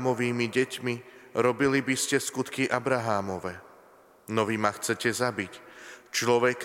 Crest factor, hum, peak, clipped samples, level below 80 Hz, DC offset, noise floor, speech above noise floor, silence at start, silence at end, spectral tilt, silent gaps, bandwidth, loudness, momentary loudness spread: 22 dB; none; -6 dBFS; under 0.1%; -68 dBFS; under 0.1%; -56 dBFS; 29 dB; 0 s; 0 s; -4 dB/octave; none; 16.5 kHz; -28 LUFS; 13 LU